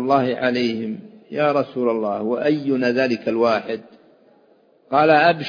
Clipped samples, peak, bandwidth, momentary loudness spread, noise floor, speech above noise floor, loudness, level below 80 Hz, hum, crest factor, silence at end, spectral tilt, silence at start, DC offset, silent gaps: under 0.1%; 0 dBFS; 5.2 kHz; 14 LU; -56 dBFS; 37 dB; -20 LUFS; -68 dBFS; none; 20 dB; 0 s; -7 dB/octave; 0 s; under 0.1%; none